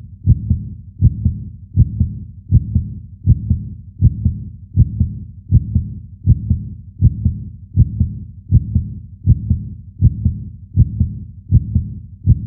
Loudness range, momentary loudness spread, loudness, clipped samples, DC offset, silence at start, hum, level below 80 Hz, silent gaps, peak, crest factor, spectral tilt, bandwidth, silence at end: 0 LU; 14 LU; -18 LUFS; under 0.1%; under 0.1%; 0 s; none; -24 dBFS; none; 0 dBFS; 16 dB; -19.5 dB/octave; 0.7 kHz; 0 s